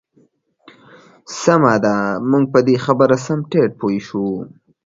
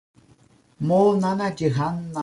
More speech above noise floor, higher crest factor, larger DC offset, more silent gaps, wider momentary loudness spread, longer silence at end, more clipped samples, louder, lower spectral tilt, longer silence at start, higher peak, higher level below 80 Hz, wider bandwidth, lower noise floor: first, 41 dB vs 35 dB; about the same, 18 dB vs 16 dB; neither; neither; about the same, 10 LU vs 8 LU; first, 0.4 s vs 0 s; neither; first, -16 LUFS vs -22 LUFS; about the same, -6.5 dB/octave vs -7.5 dB/octave; first, 1.3 s vs 0.8 s; first, 0 dBFS vs -8 dBFS; about the same, -58 dBFS vs -58 dBFS; second, 7.8 kHz vs 11.5 kHz; about the same, -57 dBFS vs -56 dBFS